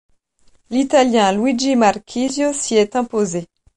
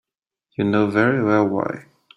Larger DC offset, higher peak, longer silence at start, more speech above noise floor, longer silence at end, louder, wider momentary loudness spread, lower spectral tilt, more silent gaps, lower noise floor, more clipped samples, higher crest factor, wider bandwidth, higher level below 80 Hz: neither; about the same, -2 dBFS vs -4 dBFS; about the same, 0.7 s vs 0.6 s; second, 39 dB vs 58 dB; about the same, 0.3 s vs 0.35 s; first, -17 LUFS vs -20 LUFS; second, 8 LU vs 14 LU; second, -4 dB/octave vs -8.5 dB/octave; neither; second, -55 dBFS vs -77 dBFS; neither; about the same, 16 dB vs 18 dB; first, 11.5 kHz vs 6.2 kHz; first, -54 dBFS vs -60 dBFS